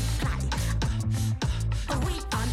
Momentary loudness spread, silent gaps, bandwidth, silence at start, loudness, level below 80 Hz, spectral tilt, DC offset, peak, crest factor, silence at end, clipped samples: 1 LU; none; 15 kHz; 0 s; -29 LUFS; -32 dBFS; -5 dB/octave; under 0.1%; -16 dBFS; 10 dB; 0 s; under 0.1%